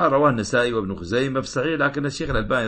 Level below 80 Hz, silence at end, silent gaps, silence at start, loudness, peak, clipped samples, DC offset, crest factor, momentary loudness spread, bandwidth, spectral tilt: -38 dBFS; 0 s; none; 0 s; -22 LUFS; -6 dBFS; under 0.1%; under 0.1%; 16 dB; 6 LU; 8.8 kHz; -5.5 dB/octave